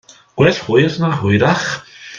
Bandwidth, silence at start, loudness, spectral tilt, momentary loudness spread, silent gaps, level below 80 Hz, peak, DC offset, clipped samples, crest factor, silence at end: 7.4 kHz; 0.35 s; -15 LUFS; -6 dB/octave; 11 LU; none; -50 dBFS; 0 dBFS; under 0.1%; under 0.1%; 16 dB; 0 s